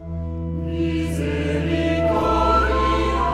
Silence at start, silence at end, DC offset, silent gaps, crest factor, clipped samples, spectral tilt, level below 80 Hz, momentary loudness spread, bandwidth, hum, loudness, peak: 0 s; 0 s; under 0.1%; none; 16 dB; under 0.1%; -7 dB/octave; -28 dBFS; 10 LU; 13 kHz; none; -21 LUFS; -4 dBFS